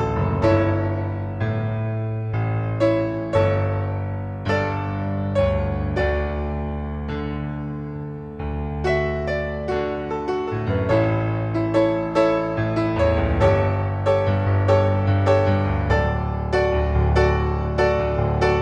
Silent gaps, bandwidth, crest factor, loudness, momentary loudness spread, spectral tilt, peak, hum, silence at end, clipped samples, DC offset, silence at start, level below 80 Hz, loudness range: none; 8 kHz; 16 dB; -22 LUFS; 9 LU; -8.5 dB/octave; -4 dBFS; none; 0 s; under 0.1%; under 0.1%; 0 s; -30 dBFS; 6 LU